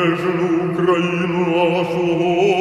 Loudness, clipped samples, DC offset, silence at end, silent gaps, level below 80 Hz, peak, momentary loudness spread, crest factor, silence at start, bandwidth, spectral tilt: -18 LUFS; under 0.1%; under 0.1%; 0 s; none; -54 dBFS; -4 dBFS; 3 LU; 12 dB; 0 s; 10.5 kHz; -7 dB/octave